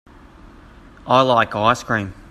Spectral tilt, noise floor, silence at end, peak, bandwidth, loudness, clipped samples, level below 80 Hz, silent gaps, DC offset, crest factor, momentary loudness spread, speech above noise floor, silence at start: -5 dB/octave; -44 dBFS; 0.1 s; 0 dBFS; 13.5 kHz; -17 LUFS; under 0.1%; -48 dBFS; none; under 0.1%; 20 dB; 9 LU; 26 dB; 1.05 s